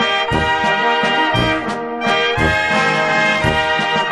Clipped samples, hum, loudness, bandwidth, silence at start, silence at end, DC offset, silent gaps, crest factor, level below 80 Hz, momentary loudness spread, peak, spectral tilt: under 0.1%; none; -15 LUFS; 12 kHz; 0 s; 0 s; under 0.1%; none; 14 dB; -36 dBFS; 3 LU; -2 dBFS; -4.5 dB/octave